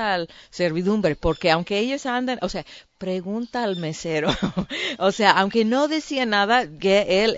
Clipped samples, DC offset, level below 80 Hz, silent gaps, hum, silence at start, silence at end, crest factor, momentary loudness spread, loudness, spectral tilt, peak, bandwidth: under 0.1%; under 0.1%; -44 dBFS; none; none; 0 s; 0 s; 22 dB; 10 LU; -22 LUFS; -5 dB/octave; 0 dBFS; 8 kHz